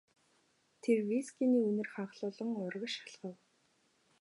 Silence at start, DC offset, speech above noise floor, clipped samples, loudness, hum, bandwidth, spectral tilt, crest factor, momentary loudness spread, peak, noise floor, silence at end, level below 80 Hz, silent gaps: 0.85 s; under 0.1%; 39 dB; under 0.1%; -35 LUFS; none; 11.5 kHz; -5.5 dB/octave; 18 dB; 13 LU; -18 dBFS; -74 dBFS; 0.85 s; under -90 dBFS; none